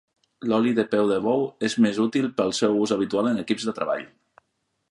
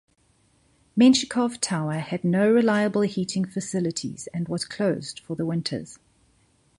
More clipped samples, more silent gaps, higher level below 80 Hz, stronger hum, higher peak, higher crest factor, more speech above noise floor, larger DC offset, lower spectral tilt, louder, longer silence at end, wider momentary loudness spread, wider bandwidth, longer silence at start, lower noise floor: neither; neither; about the same, -66 dBFS vs -64 dBFS; neither; about the same, -8 dBFS vs -6 dBFS; about the same, 16 dB vs 18 dB; first, 52 dB vs 40 dB; neither; about the same, -5 dB/octave vs -5 dB/octave; about the same, -23 LUFS vs -24 LUFS; about the same, 0.85 s vs 0.85 s; second, 6 LU vs 13 LU; about the same, 11.5 kHz vs 11.5 kHz; second, 0.4 s vs 0.95 s; first, -75 dBFS vs -64 dBFS